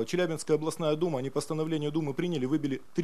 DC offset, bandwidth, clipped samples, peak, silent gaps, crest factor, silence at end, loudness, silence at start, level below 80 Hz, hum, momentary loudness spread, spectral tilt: 0.5%; 13.5 kHz; under 0.1%; -14 dBFS; none; 16 dB; 0 s; -30 LUFS; 0 s; -70 dBFS; none; 4 LU; -6 dB/octave